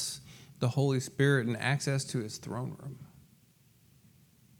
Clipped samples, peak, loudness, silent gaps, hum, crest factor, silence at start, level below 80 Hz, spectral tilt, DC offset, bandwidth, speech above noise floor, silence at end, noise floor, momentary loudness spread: under 0.1%; -12 dBFS; -31 LUFS; none; none; 20 dB; 0 s; -72 dBFS; -5 dB/octave; under 0.1%; 16.5 kHz; 33 dB; 1.55 s; -64 dBFS; 18 LU